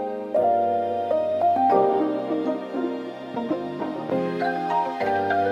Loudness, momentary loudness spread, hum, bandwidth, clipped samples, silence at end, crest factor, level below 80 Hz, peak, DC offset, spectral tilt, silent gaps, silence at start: -24 LUFS; 10 LU; none; 9.4 kHz; under 0.1%; 0 s; 16 dB; -70 dBFS; -6 dBFS; under 0.1%; -7.5 dB/octave; none; 0 s